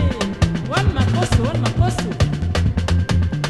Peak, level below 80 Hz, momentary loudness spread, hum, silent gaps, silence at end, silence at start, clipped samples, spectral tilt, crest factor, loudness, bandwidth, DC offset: -2 dBFS; -24 dBFS; 3 LU; none; none; 0 s; 0 s; under 0.1%; -6 dB/octave; 16 dB; -19 LUFS; 12.5 kHz; under 0.1%